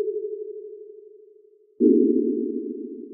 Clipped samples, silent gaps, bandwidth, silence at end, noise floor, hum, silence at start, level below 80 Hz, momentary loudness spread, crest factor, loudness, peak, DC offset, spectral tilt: under 0.1%; none; 0.6 kHz; 0 s; -55 dBFS; none; 0 s; -90 dBFS; 22 LU; 18 dB; -23 LUFS; -6 dBFS; under 0.1%; -13.5 dB/octave